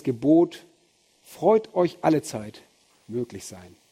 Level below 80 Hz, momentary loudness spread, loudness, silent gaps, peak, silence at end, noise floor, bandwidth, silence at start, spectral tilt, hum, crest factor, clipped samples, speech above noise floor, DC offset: -66 dBFS; 20 LU; -24 LUFS; none; -6 dBFS; 0.3 s; -63 dBFS; 15 kHz; 0.05 s; -6.5 dB/octave; none; 18 dB; under 0.1%; 40 dB; under 0.1%